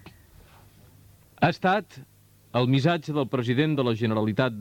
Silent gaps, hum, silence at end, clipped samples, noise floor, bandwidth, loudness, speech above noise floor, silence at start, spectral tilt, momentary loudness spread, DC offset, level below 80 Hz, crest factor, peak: none; none; 0 s; under 0.1%; -54 dBFS; 17 kHz; -25 LUFS; 30 dB; 0.05 s; -7.5 dB/octave; 5 LU; under 0.1%; -60 dBFS; 18 dB; -8 dBFS